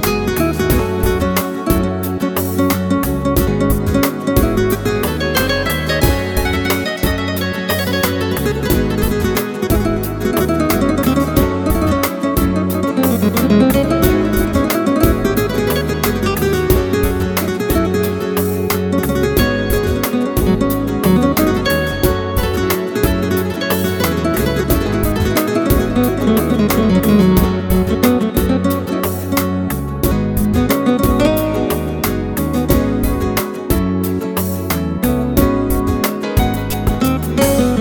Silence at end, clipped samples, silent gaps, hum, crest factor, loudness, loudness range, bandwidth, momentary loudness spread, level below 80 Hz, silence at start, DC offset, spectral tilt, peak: 0 s; under 0.1%; none; none; 14 dB; -16 LUFS; 3 LU; 19 kHz; 4 LU; -26 dBFS; 0 s; under 0.1%; -6 dB/octave; 0 dBFS